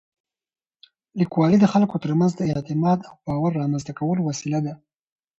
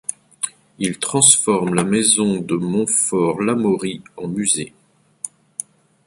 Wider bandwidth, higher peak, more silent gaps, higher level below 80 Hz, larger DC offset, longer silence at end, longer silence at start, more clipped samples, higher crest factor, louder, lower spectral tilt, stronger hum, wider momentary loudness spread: second, 8 kHz vs 13 kHz; second, -4 dBFS vs 0 dBFS; neither; about the same, -56 dBFS vs -58 dBFS; neither; second, 0.65 s vs 0.8 s; first, 1.15 s vs 0.1 s; neither; about the same, 18 dB vs 20 dB; second, -22 LUFS vs -17 LUFS; first, -7.5 dB/octave vs -3.5 dB/octave; neither; second, 9 LU vs 19 LU